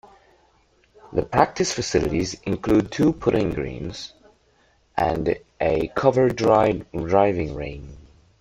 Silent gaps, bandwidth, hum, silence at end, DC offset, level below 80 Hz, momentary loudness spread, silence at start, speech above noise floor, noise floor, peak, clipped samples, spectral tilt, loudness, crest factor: none; 15 kHz; none; 0.4 s; under 0.1%; -44 dBFS; 13 LU; 1.05 s; 39 dB; -61 dBFS; 0 dBFS; under 0.1%; -5.5 dB/octave; -22 LUFS; 22 dB